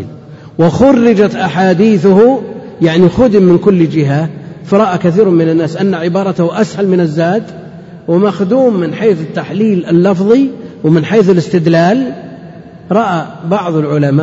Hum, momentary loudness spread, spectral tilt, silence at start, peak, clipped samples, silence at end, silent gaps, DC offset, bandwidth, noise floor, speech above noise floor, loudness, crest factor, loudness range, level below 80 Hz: none; 10 LU; -8 dB/octave; 0 s; 0 dBFS; 0.6%; 0 s; none; under 0.1%; 8 kHz; -31 dBFS; 22 dB; -10 LUFS; 10 dB; 4 LU; -44 dBFS